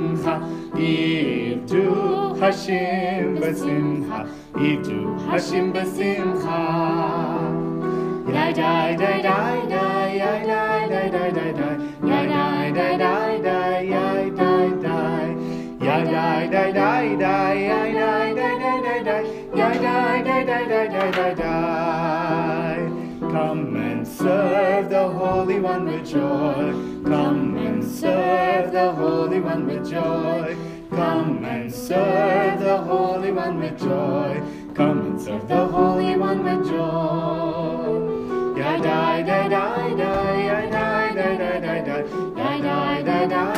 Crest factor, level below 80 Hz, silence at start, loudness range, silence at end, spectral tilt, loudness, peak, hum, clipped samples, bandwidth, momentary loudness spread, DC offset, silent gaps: 16 dB; -52 dBFS; 0 s; 2 LU; 0 s; -7 dB/octave; -21 LUFS; -6 dBFS; none; under 0.1%; 15.5 kHz; 6 LU; under 0.1%; none